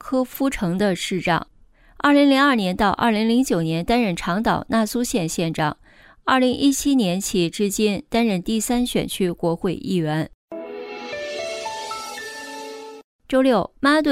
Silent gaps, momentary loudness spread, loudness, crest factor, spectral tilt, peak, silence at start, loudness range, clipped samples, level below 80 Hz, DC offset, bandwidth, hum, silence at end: 10.34-10.48 s, 13.04-13.19 s; 14 LU; -21 LUFS; 16 dB; -4.5 dB/octave; -6 dBFS; 0.05 s; 8 LU; under 0.1%; -46 dBFS; under 0.1%; 16 kHz; none; 0 s